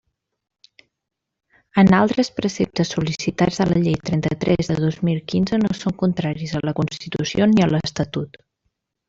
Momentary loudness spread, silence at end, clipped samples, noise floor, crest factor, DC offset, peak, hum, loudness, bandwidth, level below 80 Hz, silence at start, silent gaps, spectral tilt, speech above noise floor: 9 LU; 0.8 s; under 0.1%; -74 dBFS; 18 dB; under 0.1%; -4 dBFS; none; -20 LUFS; 7.8 kHz; -48 dBFS; 1.75 s; none; -6.5 dB/octave; 54 dB